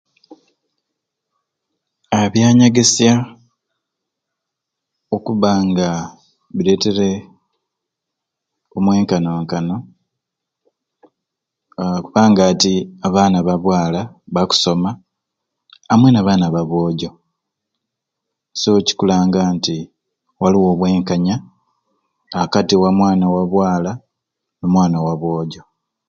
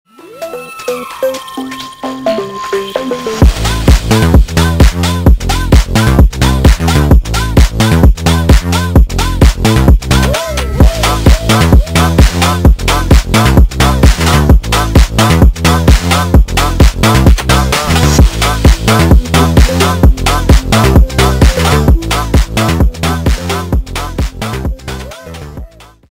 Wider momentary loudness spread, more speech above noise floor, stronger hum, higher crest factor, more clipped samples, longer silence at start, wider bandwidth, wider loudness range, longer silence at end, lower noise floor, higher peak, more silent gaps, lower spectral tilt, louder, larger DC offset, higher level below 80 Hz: first, 14 LU vs 11 LU; first, 66 dB vs 12 dB; neither; first, 18 dB vs 8 dB; second, under 0.1% vs 0.5%; about the same, 0.3 s vs 0.25 s; second, 9 kHz vs 16.5 kHz; about the same, 6 LU vs 5 LU; about the same, 0.5 s vs 0.45 s; first, -80 dBFS vs -30 dBFS; about the same, 0 dBFS vs 0 dBFS; neither; about the same, -5.5 dB/octave vs -5.5 dB/octave; second, -15 LUFS vs -10 LUFS; neither; second, -48 dBFS vs -12 dBFS